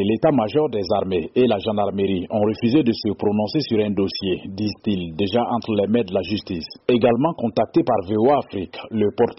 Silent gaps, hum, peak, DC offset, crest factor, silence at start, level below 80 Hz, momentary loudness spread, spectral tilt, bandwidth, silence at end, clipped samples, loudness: none; none; -6 dBFS; under 0.1%; 14 dB; 0 s; -52 dBFS; 7 LU; -5.5 dB/octave; 6 kHz; 0.05 s; under 0.1%; -21 LUFS